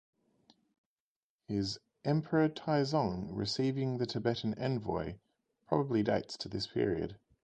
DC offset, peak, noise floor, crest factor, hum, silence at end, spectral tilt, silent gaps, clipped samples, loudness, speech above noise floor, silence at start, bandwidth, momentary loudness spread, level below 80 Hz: under 0.1%; -14 dBFS; under -90 dBFS; 22 dB; none; 0.3 s; -6.5 dB/octave; none; under 0.1%; -34 LUFS; over 57 dB; 1.5 s; 9.4 kHz; 8 LU; -60 dBFS